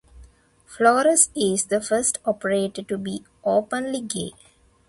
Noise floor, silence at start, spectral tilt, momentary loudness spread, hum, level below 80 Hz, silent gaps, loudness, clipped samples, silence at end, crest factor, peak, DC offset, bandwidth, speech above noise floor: -52 dBFS; 0.15 s; -3 dB/octave; 13 LU; none; -56 dBFS; none; -22 LUFS; under 0.1%; 0.55 s; 20 dB; -4 dBFS; under 0.1%; 12 kHz; 30 dB